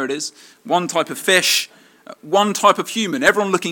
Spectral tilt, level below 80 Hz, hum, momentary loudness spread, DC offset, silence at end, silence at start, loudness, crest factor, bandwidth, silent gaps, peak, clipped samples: -2.5 dB/octave; -62 dBFS; none; 10 LU; under 0.1%; 0 s; 0 s; -17 LUFS; 18 dB; 17.5 kHz; none; 0 dBFS; under 0.1%